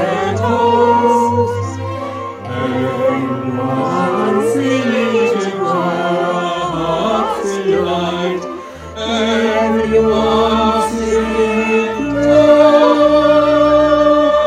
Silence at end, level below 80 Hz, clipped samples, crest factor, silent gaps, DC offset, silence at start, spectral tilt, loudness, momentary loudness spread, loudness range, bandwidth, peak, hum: 0 s; -40 dBFS; under 0.1%; 14 dB; none; under 0.1%; 0 s; -6 dB/octave; -14 LUFS; 10 LU; 6 LU; 13 kHz; 0 dBFS; none